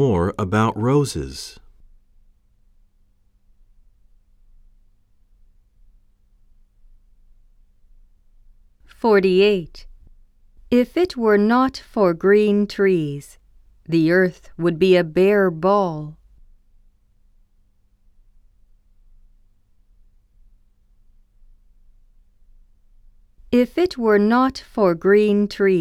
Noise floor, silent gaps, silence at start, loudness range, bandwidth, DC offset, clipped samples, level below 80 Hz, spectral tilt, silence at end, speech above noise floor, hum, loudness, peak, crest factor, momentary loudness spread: -58 dBFS; none; 0 s; 9 LU; 13 kHz; under 0.1%; under 0.1%; -48 dBFS; -7 dB/octave; 0 s; 40 dB; none; -18 LUFS; -4 dBFS; 18 dB; 10 LU